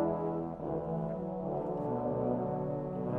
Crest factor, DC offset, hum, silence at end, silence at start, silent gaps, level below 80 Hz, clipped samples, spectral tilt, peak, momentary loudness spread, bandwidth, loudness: 14 dB; under 0.1%; none; 0 s; 0 s; none; -58 dBFS; under 0.1%; -11.5 dB/octave; -20 dBFS; 4 LU; 4 kHz; -35 LUFS